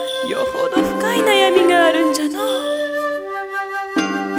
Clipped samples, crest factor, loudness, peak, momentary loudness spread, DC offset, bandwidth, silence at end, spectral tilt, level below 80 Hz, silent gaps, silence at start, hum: under 0.1%; 16 dB; -17 LUFS; -2 dBFS; 11 LU; under 0.1%; 17 kHz; 0 s; -3 dB/octave; -54 dBFS; none; 0 s; none